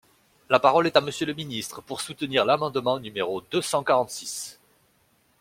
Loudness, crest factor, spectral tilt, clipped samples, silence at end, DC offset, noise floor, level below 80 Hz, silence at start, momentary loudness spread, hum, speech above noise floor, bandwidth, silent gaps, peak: -25 LUFS; 22 dB; -3.5 dB/octave; under 0.1%; 0.9 s; under 0.1%; -65 dBFS; -66 dBFS; 0.5 s; 14 LU; none; 40 dB; 16.5 kHz; none; -2 dBFS